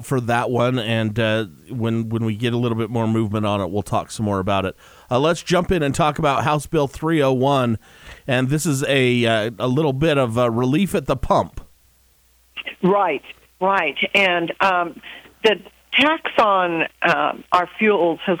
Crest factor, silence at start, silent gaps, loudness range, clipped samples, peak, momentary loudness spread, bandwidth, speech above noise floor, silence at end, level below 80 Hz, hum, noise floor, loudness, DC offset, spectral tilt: 18 dB; 0 s; none; 4 LU; under 0.1%; -2 dBFS; 7 LU; over 20 kHz; 37 dB; 0 s; -44 dBFS; none; -57 dBFS; -19 LUFS; under 0.1%; -5.5 dB/octave